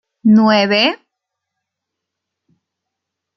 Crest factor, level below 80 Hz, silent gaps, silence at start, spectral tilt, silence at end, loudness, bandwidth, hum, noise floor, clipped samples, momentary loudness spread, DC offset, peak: 16 dB; -62 dBFS; none; 0.25 s; -6 dB/octave; 2.4 s; -12 LUFS; 6.2 kHz; none; -80 dBFS; under 0.1%; 8 LU; under 0.1%; -2 dBFS